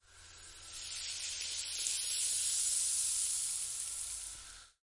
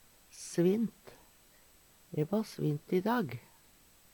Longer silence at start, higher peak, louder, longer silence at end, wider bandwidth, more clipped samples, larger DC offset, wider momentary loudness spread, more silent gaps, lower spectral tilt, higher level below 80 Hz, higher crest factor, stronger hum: second, 0.1 s vs 0.35 s; first, -14 dBFS vs -18 dBFS; about the same, -34 LUFS vs -34 LUFS; second, 0.15 s vs 0.75 s; second, 11.5 kHz vs 19 kHz; neither; neither; about the same, 17 LU vs 15 LU; neither; second, 3 dB/octave vs -6.5 dB/octave; about the same, -66 dBFS vs -70 dBFS; first, 24 dB vs 18 dB; neither